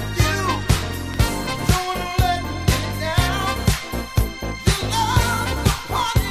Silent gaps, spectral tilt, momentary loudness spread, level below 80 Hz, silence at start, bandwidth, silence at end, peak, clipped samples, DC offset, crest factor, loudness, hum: none; -4.5 dB/octave; 4 LU; -26 dBFS; 0 s; 16 kHz; 0 s; -2 dBFS; under 0.1%; under 0.1%; 18 dB; -21 LUFS; none